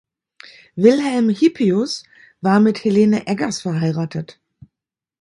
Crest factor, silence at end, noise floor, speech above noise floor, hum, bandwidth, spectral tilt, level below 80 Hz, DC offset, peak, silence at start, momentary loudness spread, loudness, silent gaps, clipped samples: 18 dB; 0.9 s; -86 dBFS; 69 dB; none; 11 kHz; -6.5 dB/octave; -62 dBFS; under 0.1%; 0 dBFS; 0.75 s; 12 LU; -17 LUFS; none; under 0.1%